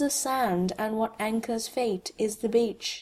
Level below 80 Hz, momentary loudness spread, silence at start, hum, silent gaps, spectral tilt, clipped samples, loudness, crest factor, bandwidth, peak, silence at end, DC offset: -62 dBFS; 4 LU; 0 s; none; none; -4 dB/octave; under 0.1%; -28 LUFS; 16 dB; 15 kHz; -12 dBFS; 0 s; under 0.1%